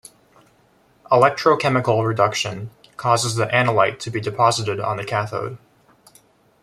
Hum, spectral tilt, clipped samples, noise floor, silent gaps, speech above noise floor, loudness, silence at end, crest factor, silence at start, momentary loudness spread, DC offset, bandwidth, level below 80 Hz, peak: none; -4.5 dB/octave; under 0.1%; -57 dBFS; none; 38 dB; -19 LUFS; 1.05 s; 20 dB; 1.1 s; 11 LU; under 0.1%; 14.5 kHz; -60 dBFS; -2 dBFS